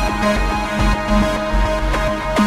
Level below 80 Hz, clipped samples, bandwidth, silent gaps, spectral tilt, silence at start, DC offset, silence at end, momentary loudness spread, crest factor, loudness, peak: -22 dBFS; under 0.1%; 14.5 kHz; none; -5.5 dB/octave; 0 s; under 0.1%; 0 s; 2 LU; 14 dB; -18 LUFS; -2 dBFS